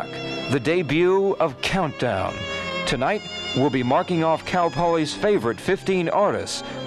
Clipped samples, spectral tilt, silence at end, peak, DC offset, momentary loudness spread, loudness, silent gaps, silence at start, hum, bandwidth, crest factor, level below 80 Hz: under 0.1%; -5.5 dB/octave; 0 s; -6 dBFS; under 0.1%; 7 LU; -22 LUFS; none; 0 s; none; 13 kHz; 16 dB; -48 dBFS